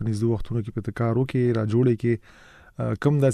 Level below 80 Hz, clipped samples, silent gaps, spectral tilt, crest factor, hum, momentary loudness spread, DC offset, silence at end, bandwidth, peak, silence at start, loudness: -46 dBFS; under 0.1%; none; -8.5 dB/octave; 16 dB; none; 9 LU; under 0.1%; 0 s; 10.5 kHz; -8 dBFS; 0 s; -24 LUFS